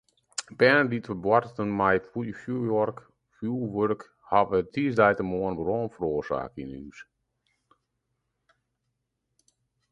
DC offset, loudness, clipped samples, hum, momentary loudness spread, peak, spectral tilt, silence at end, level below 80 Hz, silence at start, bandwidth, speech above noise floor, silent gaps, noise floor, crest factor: under 0.1%; -26 LUFS; under 0.1%; none; 15 LU; -6 dBFS; -6 dB/octave; 2.9 s; -58 dBFS; 0.4 s; 11 kHz; 54 dB; none; -80 dBFS; 22 dB